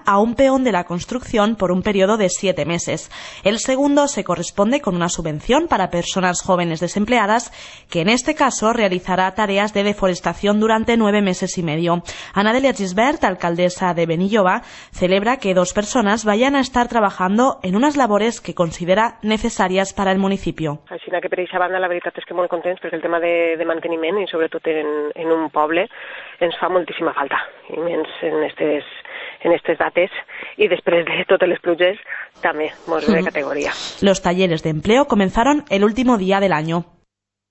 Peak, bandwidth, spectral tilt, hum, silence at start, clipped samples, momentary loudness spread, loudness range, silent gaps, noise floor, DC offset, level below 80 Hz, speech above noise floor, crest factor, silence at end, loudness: -2 dBFS; 8.4 kHz; -4.5 dB/octave; none; 0.05 s; under 0.1%; 8 LU; 4 LU; none; -71 dBFS; under 0.1%; -44 dBFS; 52 dB; 16 dB; 0.7 s; -18 LUFS